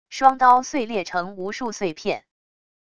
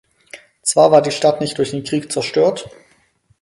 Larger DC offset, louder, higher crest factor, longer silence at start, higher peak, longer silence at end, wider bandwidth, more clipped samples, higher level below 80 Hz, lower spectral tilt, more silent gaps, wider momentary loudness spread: first, 0.5% vs under 0.1%; second, -21 LUFS vs -16 LUFS; about the same, 20 dB vs 18 dB; second, 0.1 s vs 0.35 s; about the same, -2 dBFS vs 0 dBFS; about the same, 0.8 s vs 0.75 s; second, 9.6 kHz vs 11.5 kHz; neither; about the same, -60 dBFS vs -58 dBFS; about the same, -3.5 dB/octave vs -4 dB/octave; neither; about the same, 13 LU vs 11 LU